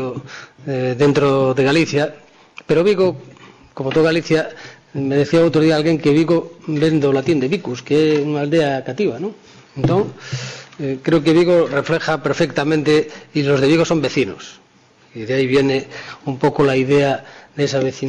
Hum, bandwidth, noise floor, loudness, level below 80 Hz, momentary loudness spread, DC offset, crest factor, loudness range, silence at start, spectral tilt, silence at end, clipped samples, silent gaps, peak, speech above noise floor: none; 10 kHz; -51 dBFS; -17 LUFS; -52 dBFS; 13 LU; under 0.1%; 12 dB; 3 LU; 0 s; -6.5 dB/octave; 0 s; under 0.1%; none; -6 dBFS; 35 dB